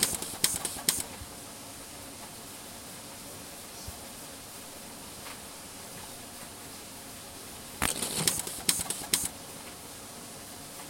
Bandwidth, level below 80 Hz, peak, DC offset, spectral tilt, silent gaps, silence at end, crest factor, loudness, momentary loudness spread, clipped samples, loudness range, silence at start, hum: 16.5 kHz; -58 dBFS; -6 dBFS; under 0.1%; -1 dB/octave; none; 0 s; 30 dB; -34 LUFS; 14 LU; under 0.1%; 11 LU; 0 s; none